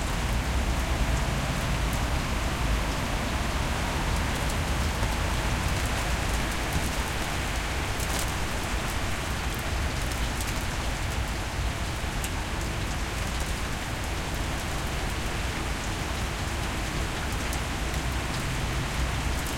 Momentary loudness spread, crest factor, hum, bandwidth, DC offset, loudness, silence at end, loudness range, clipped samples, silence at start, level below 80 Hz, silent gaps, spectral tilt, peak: 3 LU; 16 dB; none; 17 kHz; under 0.1%; -29 LUFS; 0 s; 3 LU; under 0.1%; 0 s; -32 dBFS; none; -4 dB/octave; -12 dBFS